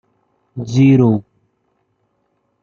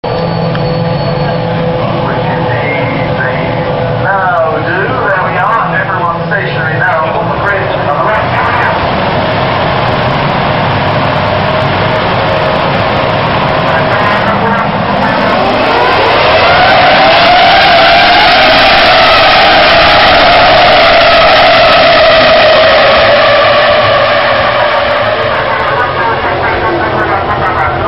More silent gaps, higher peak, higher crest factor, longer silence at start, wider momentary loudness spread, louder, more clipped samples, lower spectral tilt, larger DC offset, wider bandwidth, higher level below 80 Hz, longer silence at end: neither; about the same, -2 dBFS vs 0 dBFS; first, 16 dB vs 8 dB; first, 0.55 s vs 0.05 s; first, 20 LU vs 8 LU; second, -13 LUFS vs -7 LUFS; second, under 0.1% vs 0.3%; first, -8.5 dB/octave vs -6.5 dB/octave; second, under 0.1% vs 1%; second, 7.2 kHz vs 9.6 kHz; second, -54 dBFS vs -30 dBFS; first, 1.4 s vs 0 s